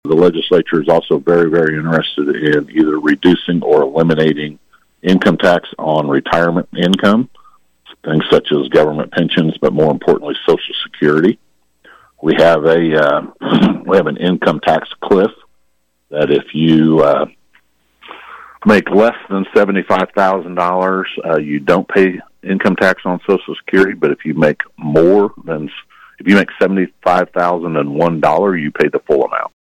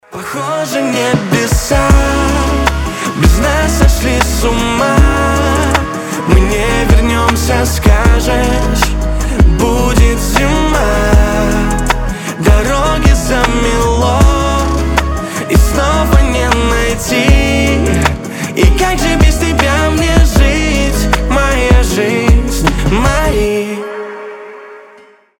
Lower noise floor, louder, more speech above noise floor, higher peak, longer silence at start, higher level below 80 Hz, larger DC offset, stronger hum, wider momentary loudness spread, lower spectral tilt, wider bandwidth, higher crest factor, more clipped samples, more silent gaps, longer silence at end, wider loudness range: first, -63 dBFS vs -41 dBFS; about the same, -13 LUFS vs -12 LUFS; first, 50 dB vs 27 dB; about the same, 0 dBFS vs 0 dBFS; about the same, 0.05 s vs 0.1 s; second, -50 dBFS vs -14 dBFS; neither; neither; about the same, 7 LU vs 6 LU; first, -7 dB/octave vs -5 dB/octave; second, 12.5 kHz vs 17.5 kHz; about the same, 12 dB vs 10 dB; neither; neither; second, 0.15 s vs 0.6 s; about the same, 2 LU vs 1 LU